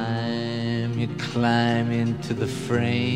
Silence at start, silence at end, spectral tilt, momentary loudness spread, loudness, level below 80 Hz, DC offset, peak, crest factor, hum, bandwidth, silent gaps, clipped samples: 0 s; 0 s; -6.5 dB/octave; 6 LU; -25 LUFS; -56 dBFS; 0.3%; -6 dBFS; 18 dB; none; 11.5 kHz; none; under 0.1%